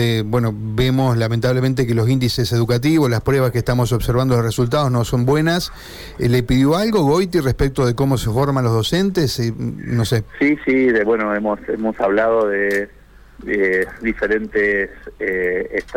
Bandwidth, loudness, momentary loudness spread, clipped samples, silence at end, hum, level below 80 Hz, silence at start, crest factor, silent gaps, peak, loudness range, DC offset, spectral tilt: 18 kHz; -18 LUFS; 7 LU; under 0.1%; 0 s; none; -36 dBFS; 0 s; 12 dB; none; -6 dBFS; 2 LU; under 0.1%; -6.5 dB/octave